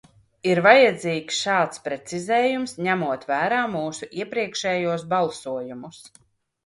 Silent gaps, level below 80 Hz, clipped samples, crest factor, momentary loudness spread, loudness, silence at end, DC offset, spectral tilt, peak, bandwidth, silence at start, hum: none; -68 dBFS; under 0.1%; 22 dB; 16 LU; -22 LUFS; 0.6 s; under 0.1%; -4 dB/octave; 0 dBFS; 11.5 kHz; 0.45 s; none